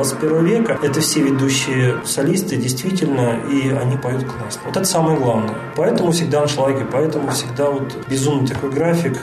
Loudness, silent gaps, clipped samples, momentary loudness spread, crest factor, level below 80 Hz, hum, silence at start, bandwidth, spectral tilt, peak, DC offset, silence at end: -18 LUFS; none; under 0.1%; 5 LU; 12 dB; -52 dBFS; none; 0 s; 13.5 kHz; -5 dB/octave; -6 dBFS; under 0.1%; 0 s